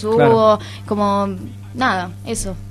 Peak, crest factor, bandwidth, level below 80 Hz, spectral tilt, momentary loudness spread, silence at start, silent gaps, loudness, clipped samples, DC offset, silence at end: 0 dBFS; 16 dB; 13 kHz; -40 dBFS; -5.5 dB/octave; 13 LU; 0 s; none; -17 LUFS; under 0.1%; under 0.1%; 0 s